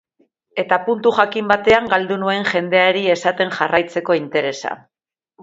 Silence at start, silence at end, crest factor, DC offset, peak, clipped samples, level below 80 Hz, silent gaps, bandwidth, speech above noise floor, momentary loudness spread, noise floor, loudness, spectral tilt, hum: 0.55 s; 0.65 s; 18 dB; under 0.1%; 0 dBFS; under 0.1%; -54 dBFS; none; 7.8 kHz; 45 dB; 10 LU; -62 dBFS; -17 LUFS; -4.5 dB/octave; none